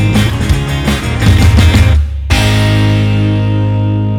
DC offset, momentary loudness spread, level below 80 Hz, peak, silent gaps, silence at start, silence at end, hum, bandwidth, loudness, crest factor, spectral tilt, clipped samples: under 0.1%; 6 LU; -16 dBFS; 0 dBFS; none; 0 s; 0 s; none; 15.5 kHz; -11 LUFS; 10 dB; -6 dB/octave; 0.3%